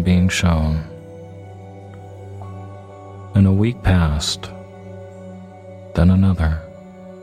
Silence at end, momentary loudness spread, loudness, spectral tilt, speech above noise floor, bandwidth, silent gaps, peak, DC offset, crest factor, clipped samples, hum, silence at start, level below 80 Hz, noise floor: 0 s; 22 LU; -18 LUFS; -6 dB/octave; 22 dB; 12.5 kHz; none; 0 dBFS; under 0.1%; 18 dB; under 0.1%; none; 0 s; -30 dBFS; -38 dBFS